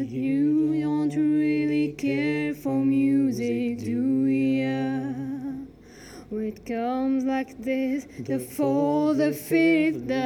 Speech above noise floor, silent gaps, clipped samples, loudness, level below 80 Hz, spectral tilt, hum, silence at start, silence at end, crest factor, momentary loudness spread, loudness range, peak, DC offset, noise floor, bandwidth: 22 dB; none; under 0.1%; -25 LUFS; -60 dBFS; -7 dB/octave; none; 0 s; 0 s; 12 dB; 10 LU; 5 LU; -12 dBFS; under 0.1%; -46 dBFS; 18 kHz